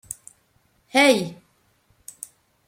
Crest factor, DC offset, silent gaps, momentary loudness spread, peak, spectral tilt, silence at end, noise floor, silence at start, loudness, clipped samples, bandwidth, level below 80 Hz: 22 dB; under 0.1%; none; 24 LU; -4 dBFS; -3 dB/octave; 1.35 s; -64 dBFS; 0.95 s; -19 LUFS; under 0.1%; 16.5 kHz; -68 dBFS